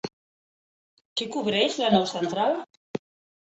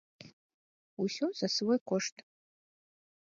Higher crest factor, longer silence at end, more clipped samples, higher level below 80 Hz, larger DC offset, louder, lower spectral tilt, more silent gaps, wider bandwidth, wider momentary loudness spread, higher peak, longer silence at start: about the same, 20 dB vs 20 dB; second, 0.45 s vs 1.25 s; neither; first, -68 dBFS vs -84 dBFS; neither; first, -25 LUFS vs -33 LUFS; about the same, -4.5 dB/octave vs -4 dB/octave; first, 0.13-1.16 s, 2.77-2.94 s vs 0.33-0.97 s, 1.81-1.86 s; about the same, 8.2 kHz vs 7.8 kHz; first, 15 LU vs 8 LU; first, -8 dBFS vs -18 dBFS; second, 0.05 s vs 0.2 s